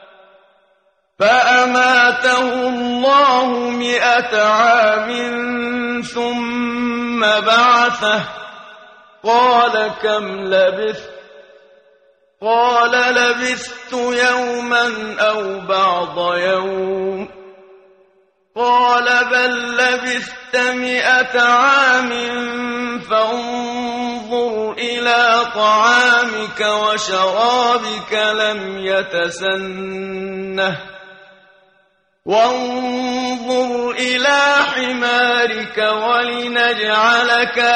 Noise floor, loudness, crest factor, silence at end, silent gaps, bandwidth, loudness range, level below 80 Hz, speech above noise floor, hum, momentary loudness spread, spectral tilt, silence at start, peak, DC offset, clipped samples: -60 dBFS; -15 LUFS; 16 dB; 0 s; none; 9.4 kHz; 6 LU; -58 dBFS; 44 dB; none; 10 LU; -2.5 dB/octave; 1.2 s; -2 dBFS; under 0.1%; under 0.1%